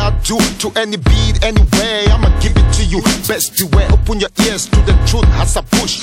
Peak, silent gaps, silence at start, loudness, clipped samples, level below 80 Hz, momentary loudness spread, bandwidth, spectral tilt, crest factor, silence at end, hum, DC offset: 0 dBFS; none; 0 s; -13 LUFS; under 0.1%; -14 dBFS; 3 LU; 17 kHz; -4.5 dB/octave; 10 dB; 0 s; none; under 0.1%